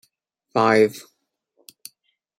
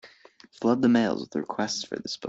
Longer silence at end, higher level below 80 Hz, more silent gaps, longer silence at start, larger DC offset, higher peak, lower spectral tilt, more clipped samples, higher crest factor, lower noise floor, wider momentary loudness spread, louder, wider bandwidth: first, 1.4 s vs 0 s; about the same, -70 dBFS vs -66 dBFS; neither; first, 0.55 s vs 0.05 s; neither; first, -4 dBFS vs -10 dBFS; about the same, -5.5 dB/octave vs -4.5 dB/octave; neither; about the same, 20 dB vs 18 dB; first, -72 dBFS vs -54 dBFS; first, 26 LU vs 10 LU; first, -19 LUFS vs -26 LUFS; first, 16 kHz vs 8 kHz